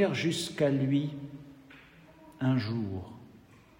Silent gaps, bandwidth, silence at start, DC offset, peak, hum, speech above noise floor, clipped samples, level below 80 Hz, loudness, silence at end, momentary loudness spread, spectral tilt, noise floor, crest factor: none; 16 kHz; 0 s; under 0.1%; -14 dBFS; none; 27 dB; under 0.1%; -68 dBFS; -31 LUFS; 0.5 s; 22 LU; -6 dB/octave; -56 dBFS; 18 dB